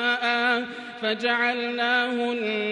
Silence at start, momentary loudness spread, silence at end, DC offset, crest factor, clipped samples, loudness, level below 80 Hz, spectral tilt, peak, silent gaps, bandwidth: 0 s; 6 LU; 0 s; under 0.1%; 14 dB; under 0.1%; -24 LUFS; -74 dBFS; -3.5 dB/octave; -10 dBFS; none; 11 kHz